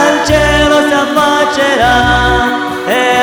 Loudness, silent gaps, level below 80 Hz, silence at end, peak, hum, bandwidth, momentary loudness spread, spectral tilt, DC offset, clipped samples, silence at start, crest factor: -10 LUFS; none; -24 dBFS; 0 s; 0 dBFS; none; over 20 kHz; 4 LU; -4 dB/octave; under 0.1%; under 0.1%; 0 s; 10 dB